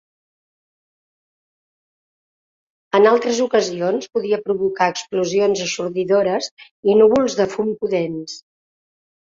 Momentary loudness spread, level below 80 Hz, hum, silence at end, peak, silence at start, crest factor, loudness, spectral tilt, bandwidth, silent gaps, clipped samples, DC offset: 10 LU; -62 dBFS; none; 0.85 s; -2 dBFS; 2.95 s; 18 dB; -18 LUFS; -4.5 dB/octave; 7.6 kHz; 6.51-6.57 s, 6.71-6.83 s; under 0.1%; under 0.1%